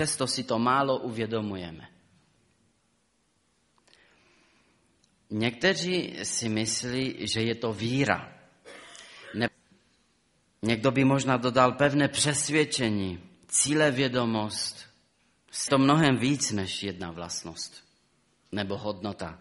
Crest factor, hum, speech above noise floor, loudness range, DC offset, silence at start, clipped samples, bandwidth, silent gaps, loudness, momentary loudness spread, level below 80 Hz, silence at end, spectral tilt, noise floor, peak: 22 dB; none; 44 dB; 8 LU; under 0.1%; 0 s; under 0.1%; 11.5 kHz; none; -27 LUFS; 16 LU; -62 dBFS; 0.05 s; -4 dB/octave; -71 dBFS; -6 dBFS